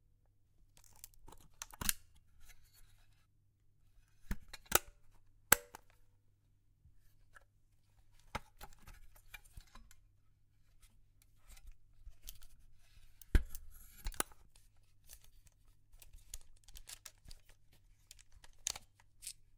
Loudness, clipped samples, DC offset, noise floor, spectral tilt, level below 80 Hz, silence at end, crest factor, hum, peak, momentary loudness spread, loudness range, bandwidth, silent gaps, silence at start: -39 LUFS; under 0.1%; under 0.1%; -71 dBFS; -2 dB/octave; -50 dBFS; 0.25 s; 42 dB; none; -4 dBFS; 28 LU; 23 LU; 17 kHz; none; 0.75 s